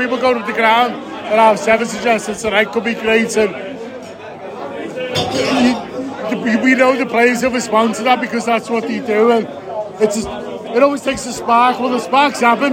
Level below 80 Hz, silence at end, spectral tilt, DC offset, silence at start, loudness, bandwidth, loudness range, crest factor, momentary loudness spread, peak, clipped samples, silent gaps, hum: -50 dBFS; 0 s; -4 dB/octave; under 0.1%; 0 s; -15 LUFS; 16.5 kHz; 4 LU; 16 dB; 14 LU; 0 dBFS; under 0.1%; none; none